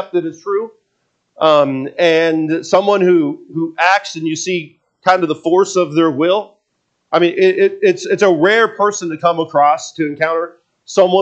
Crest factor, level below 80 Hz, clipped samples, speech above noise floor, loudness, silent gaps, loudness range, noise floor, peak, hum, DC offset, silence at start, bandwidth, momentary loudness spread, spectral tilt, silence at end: 14 dB; -70 dBFS; under 0.1%; 54 dB; -14 LUFS; none; 2 LU; -68 dBFS; 0 dBFS; none; under 0.1%; 0 s; 8.4 kHz; 9 LU; -4.5 dB/octave; 0 s